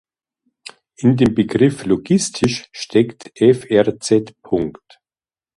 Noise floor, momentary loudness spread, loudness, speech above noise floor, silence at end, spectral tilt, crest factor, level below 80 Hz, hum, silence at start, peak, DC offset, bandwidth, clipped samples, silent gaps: under -90 dBFS; 8 LU; -17 LUFS; over 73 dB; 0.85 s; -6 dB/octave; 18 dB; -50 dBFS; none; 1 s; 0 dBFS; under 0.1%; 11.5 kHz; under 0.1%; none